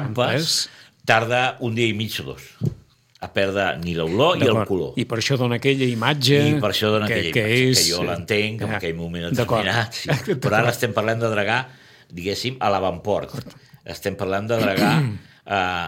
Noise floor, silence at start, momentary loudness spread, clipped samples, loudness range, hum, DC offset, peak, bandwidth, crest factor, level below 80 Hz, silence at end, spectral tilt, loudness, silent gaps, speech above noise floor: -48 dBFS; 0 s; 11 LU; under 0.1%; 5 LU; none; under 0.1%; 0 dBFS; 16.5 kHz; 20 dB; -52 dBFS; 0 s; -4.5 dB/octave; -21 LUFS; none; 27 dB